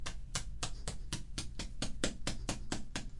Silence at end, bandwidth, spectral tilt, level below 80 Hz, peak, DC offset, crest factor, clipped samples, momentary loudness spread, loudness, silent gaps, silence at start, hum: 0 s; 11.5 kHz; -3 dB/octave; -44 dBFS; -14 dBFS; under 0.1%; 24 dB; under 0.1%; 5 LU; -41 LUFS; none; 0 s; none